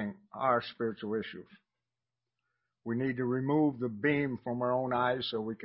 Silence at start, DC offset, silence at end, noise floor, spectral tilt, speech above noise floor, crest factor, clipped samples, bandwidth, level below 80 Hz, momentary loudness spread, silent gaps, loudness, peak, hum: 0 s; under 0.1%; 0 s; under -90 dBFS; -5 dB/octave; over 58 dB; 18 dB; under 0.1%; 5.6 kHz; -70 dBFS; 8 LU; none; -32 LUFS; -14 dBFS; none